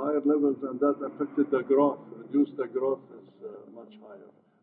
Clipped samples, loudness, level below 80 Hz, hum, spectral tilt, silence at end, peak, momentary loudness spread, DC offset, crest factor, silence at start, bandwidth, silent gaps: under 0.1%; -27 LUFS; -82 dBFS; none; -11 dB/octave; 0.45 s; -12 dBFS; 22 LU; under 0.1%; 18 dB; 0 s; 3.8 kHz; none